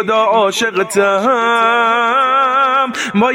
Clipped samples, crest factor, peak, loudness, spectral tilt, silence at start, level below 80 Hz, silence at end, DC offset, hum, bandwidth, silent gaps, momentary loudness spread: under 0.1%; 12 dB; 0 dBFS; -12 LUFS; -3.5 dB/octave; 0 s; -62 dBFS; 0 s; under 0.1%; none; 16.5 kHz; none; 3 LU